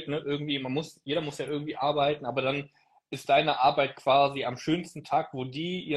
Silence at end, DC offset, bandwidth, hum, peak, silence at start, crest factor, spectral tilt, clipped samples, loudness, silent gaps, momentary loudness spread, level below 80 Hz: 0 s; under 0.1%; 12.5 kHz; none; -10 dBFS; 0 s; 18 dB; -5.5 dB/octave; under 0.1%; -28 LUFS; none; 10 LU; -66 dBFS